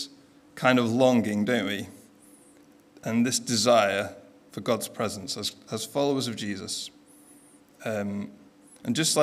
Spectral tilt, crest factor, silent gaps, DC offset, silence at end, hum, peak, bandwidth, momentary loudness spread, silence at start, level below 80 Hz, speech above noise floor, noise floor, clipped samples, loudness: -4 dB/octave; 22 dB; none; under 0.1%; 0 s; none; -6 dBFS; 16 kHz; 17 LU; 0 s; -72 dBFS; 30 dB; -56 dBFS; under 0.1%; -26 LUFS